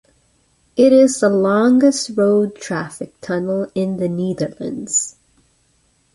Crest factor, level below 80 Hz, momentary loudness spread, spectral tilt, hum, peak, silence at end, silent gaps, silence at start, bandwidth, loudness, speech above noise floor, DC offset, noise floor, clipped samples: 16 dB; -58 dBFS; 14 LU; -5 dB/octave; none; -2 dBFS; 1.05 s; none; 0.75 s; 11.5 kHz; -17 LUFS; 44 dB; under 0.1%; -60 dBFS; under 0.1%